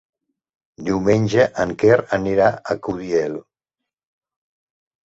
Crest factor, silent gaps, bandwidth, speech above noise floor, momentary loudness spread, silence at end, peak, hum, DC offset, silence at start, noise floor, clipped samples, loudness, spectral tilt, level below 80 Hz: 20 dB; none; 8 kHz; 66 dB; 10 LU; 1.65 s; -2 dBFS; none; under 0.1%; 0.8 s; -84 dBFS; under 0.1%; -19 LUFS; -6.5 dB/octave; -50 dBFS